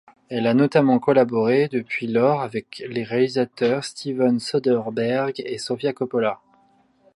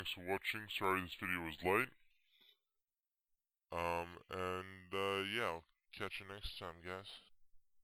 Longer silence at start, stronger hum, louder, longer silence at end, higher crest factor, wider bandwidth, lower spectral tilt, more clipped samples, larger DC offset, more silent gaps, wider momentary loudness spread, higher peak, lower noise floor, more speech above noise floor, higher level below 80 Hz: first, 0.3 s vs 0 s; neither; first, -22 LUFS vs -42 LUFS; first, 0.8 s vs 0.05 s; about the same, 18 dB vs 22 dB; second, 11.5 kHz vs 16.5 kHz; first, -6.5 dB/octave vs -4.5 dB/octave; neither; neither; neither; about the same, 11 LU vs 12 LU; first, -4 dBFS vs -22 dBFS; second, -59 dBFS vs under -90 dBFS; second, 38 dB vs over 48 dB; about the same, -68 dBFS vs -64 dBFS